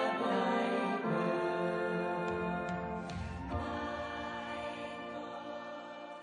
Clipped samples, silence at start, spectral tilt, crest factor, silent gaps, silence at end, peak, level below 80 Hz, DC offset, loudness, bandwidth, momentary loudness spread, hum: under 0.1%; 0 s; -6.5 dB/octave; 16 dB; none; 0 s; -20 dBFS; -56 dBFS; under 0.1%; -37 LUFS; 10 kHz; 11 LU; none